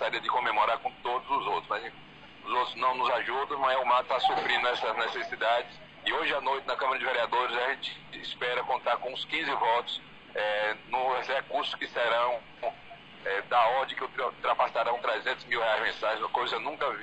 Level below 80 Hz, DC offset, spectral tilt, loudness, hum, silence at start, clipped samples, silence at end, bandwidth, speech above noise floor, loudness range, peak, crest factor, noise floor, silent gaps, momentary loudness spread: -66 dBFS; under 0.1%; -3 dB/octave; -29 LUFS; none; 0 s; under 0.1%; 0 s; 9.2 kHz; 21 dB; 3 LU; -14 dBFS; 16 dB; -50 dBFS; none; 9 LU